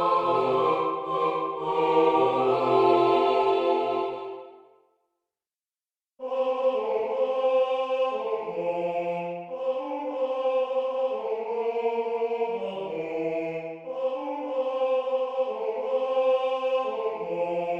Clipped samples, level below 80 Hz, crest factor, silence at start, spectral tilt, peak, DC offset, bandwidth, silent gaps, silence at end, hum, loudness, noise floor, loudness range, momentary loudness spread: under 0.1%; -76 dBFS; 18 dB; 0 s; -6.5 dB/octave; -8 dBFS; under 0.1%; 7 kHz; none; 0 s; none; -26 LUFS; under -90 dBFS; 7 LU; 10 LU